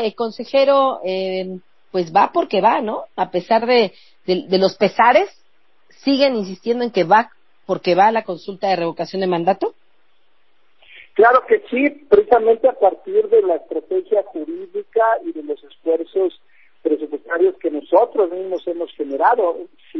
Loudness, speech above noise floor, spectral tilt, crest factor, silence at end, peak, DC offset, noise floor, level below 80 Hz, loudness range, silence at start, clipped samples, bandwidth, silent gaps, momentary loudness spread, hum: -18 LUFS; 47 dB; -6.5 dB/octave; 16 dB; 0 s; -2 dBFS; 0.3%; -64 dBFS; -62 dBFS; 5 LU; 0 s; under 0.1%; 6 kHz; none; 12 LU; none